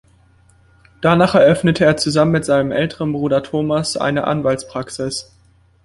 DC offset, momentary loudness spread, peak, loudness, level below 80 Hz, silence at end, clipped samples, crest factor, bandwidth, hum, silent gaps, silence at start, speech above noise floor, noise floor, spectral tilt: under 0.1%; 12 LU; -2 dBFS; -16 LUFS; -48 dBFS; 0.65 s; under 0.1%; 16 dB; 11.5 kHz; none; none; 1 s; 36 dB; -52 dBFS; -5.5 dB/octave